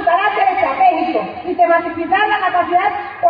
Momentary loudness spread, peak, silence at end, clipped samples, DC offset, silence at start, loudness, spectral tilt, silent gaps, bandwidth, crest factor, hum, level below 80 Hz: 6 LU; -2 dBFS; 0 s; under 0.1%; under 0.1%; 0 s; -15 LUFS; -7 dB/octave; none; 5.2 kHz; 12 dB; none; -52 dBFS